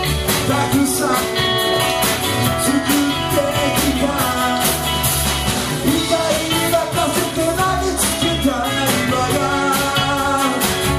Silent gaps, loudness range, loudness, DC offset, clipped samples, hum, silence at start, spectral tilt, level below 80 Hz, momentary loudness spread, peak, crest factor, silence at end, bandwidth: none; 1 LU; -17 LUFS; under 0.1%; under 0.1%; none; 0 s; -3.5 dB/octave; -34 dBFS; 2 LU; -2 dBFS; 14 dB; 0 s; 15.5 kHz